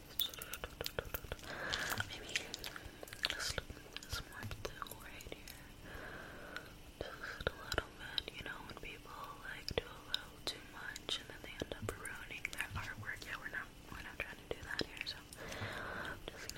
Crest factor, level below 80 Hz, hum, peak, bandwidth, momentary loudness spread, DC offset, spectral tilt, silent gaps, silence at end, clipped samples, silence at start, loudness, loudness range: 32 dB; -56 dBFS; none; -14 dBFS; 16.5 kHz; 10 LU; under 0.1%; -2.5 dB/octave; none; 0 s; under 0.1%; 0 s; -44 LUFS; 5 LU